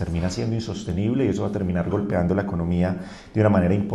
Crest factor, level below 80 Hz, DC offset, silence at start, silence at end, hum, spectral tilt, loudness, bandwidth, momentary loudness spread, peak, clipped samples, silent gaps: 16 dB; -42 dBFS; under 0.1%; 0 s; 0 s; none; -7.5 dB/octave; -23 LUFS; 10 kHz; 8 LU; -6 dBFS; under 0.1%; none